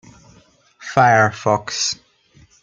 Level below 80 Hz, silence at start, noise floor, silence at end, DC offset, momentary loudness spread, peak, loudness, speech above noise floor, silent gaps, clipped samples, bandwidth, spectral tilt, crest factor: -58 dBFS; 0.8 s; -53 dBFS; 0.7 s; under 0.1%; 14 LU; 0 dBFS; -17 LUFS; 37 dB; none; under 0.1%; 9.4 kHz; -3.5 dB/octave; 20 dB